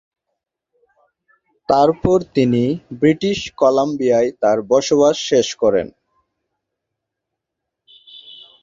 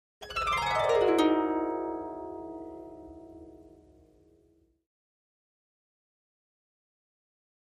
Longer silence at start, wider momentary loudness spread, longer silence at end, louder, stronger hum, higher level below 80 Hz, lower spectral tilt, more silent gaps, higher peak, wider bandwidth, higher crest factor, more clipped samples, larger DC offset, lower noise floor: first, 1.7 s vs 0.2 s; second, 7 LU vs 24 LU; second, 0.3 s vs 4.05 s; first, -16 LUFS vs -28 LUFS; neither; first, -48 dBFS vs -58 dBFS; about the same, -5.5 dB/octave vs -4.5 dB/octave; neither; first, -2 dBFS vs -12 dBFS; second, 7.8 kHz vs 14 kHz; about the same, 18 dB vs 22 dB; neither; neither; first, -81 dBFS vs -67 dBFS